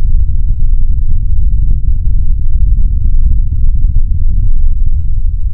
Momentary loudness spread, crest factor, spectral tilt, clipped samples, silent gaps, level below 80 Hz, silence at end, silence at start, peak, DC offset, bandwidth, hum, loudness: 2 LU; 8 dB; -16.5 dB/octave; 0.5%; none; -8 dBFS; 0 s; 0 s; 0 dBFS; 20%; 0.4 kHz; none; -16 LUFS